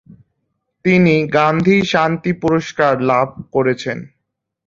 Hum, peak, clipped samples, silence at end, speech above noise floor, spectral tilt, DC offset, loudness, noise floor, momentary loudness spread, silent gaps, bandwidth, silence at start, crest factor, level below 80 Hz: none; 0 dBFS; under 0.1%; 0.6 s; 59 dB; -6.5 dB/octave; under 0.1%; -15 LUFS; -74 dBFS; 8 LU; none; 7.6 kHz; 0.85 s; 16 dB; -50 dBFS